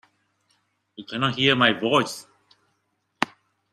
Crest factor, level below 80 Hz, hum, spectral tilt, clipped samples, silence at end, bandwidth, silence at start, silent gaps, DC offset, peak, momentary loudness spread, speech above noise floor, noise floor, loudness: 24 dB; -64 dBFS; none; -4.5 dB/octave; under 0.1%; 0.45 s; 14 kHz; 1 s; none; under 0.1%; -2 dBFS; 17 LU; 51 dB; -73 dBFS; -22 LUFS